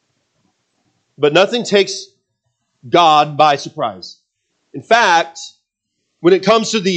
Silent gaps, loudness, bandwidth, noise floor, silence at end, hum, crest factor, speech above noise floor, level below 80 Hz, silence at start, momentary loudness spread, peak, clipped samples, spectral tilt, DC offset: none; -14 LUFS; 9 kHz; -73 dBFS; 0 s; none; 16 dB; 59 dB; -66 dBFS; 1.2 s; 22 LU; 0 dBFS; under 0.1%; -4 dB/octave; under 0.1%